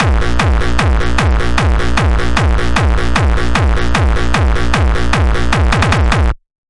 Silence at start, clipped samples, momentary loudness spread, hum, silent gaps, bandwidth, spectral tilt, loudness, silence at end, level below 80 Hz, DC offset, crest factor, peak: 0 s; under 0.1%; 2 LU; none; none; 11.5 kHz; -5.5 dB/octave; -14 LUFS; 0.15 s; -14 dBFS; 10%; 12 dB; 0 dBFS